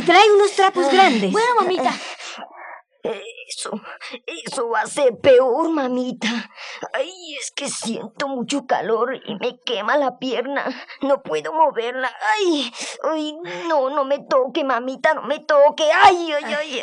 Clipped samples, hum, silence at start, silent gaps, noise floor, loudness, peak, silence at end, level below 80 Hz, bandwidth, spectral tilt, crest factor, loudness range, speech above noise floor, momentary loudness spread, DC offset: under 0.1%; none; 0 s; none; -40 dBFS; -19 LUFS; 0 dBFS; 0 s; -74 dBFS; 11.5 kHz; -3 dB/octave; 18 dB; 7 LU; 21 dB; 16 LU; under 0.1%